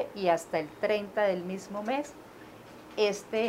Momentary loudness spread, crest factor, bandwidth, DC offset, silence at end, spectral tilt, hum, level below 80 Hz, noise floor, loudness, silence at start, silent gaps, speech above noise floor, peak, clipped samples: 21 LU; 18 dB; 16 kHz; under 0.1%; 0 s; -4.5 dB/octave; none; -68 dBFS; -49 dBFS; -31 LUFS; 0 s; none; 19 dB; -12 dBFS; under 0.1%